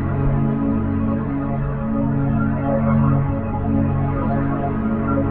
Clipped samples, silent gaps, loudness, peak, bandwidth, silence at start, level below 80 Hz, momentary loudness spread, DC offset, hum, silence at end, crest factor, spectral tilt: under 0.1%; none; -20 LUFS; -4 dBFS; 3.4 kHz; 0 s; -30 dBFS; 5 LU; under 0.1%; none; 0 s; 14 dB; -10.5 dB/octave